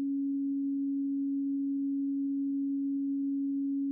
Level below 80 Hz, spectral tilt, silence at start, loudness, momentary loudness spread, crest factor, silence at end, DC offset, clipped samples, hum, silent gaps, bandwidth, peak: under -90 dBFS; -0.5 dB/octave; 0 s; -32 LUFS; 0 LU; 4 dB; 0 s; under 0.1%; under 0.1%; none; none; 0.5 kHz; -28 dBFS